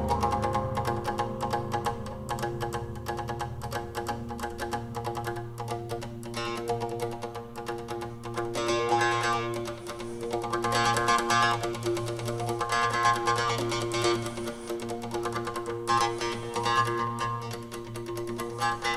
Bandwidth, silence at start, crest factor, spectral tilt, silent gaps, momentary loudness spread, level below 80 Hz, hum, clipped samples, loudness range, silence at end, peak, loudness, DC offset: 15.5 kHz; 0 s; 18 dB; -4.5 dB/octave; none; 12 LU; -50 dBFS; none; under 0.1%; 8 LU; 0 s; -10 dBFS; -30 LUFS; under 0.1%